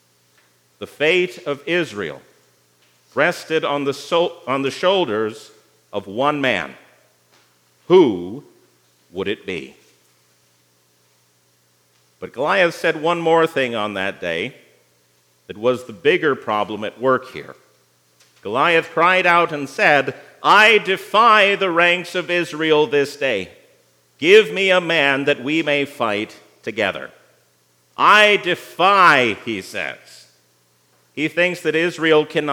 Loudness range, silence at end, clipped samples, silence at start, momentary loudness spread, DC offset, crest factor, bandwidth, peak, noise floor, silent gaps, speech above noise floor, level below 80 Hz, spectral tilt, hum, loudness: 8 LU; 0 s; under 0.1%; 0.8 s; 17 LU; under 0.1%; 20 dB; 17 kHz; 0 dBFS; -60 dBFS; none; 42 dB; -72 dBFS; -4.5 dB/octave; 60 Hz at -60 dBFS; -17 LUFS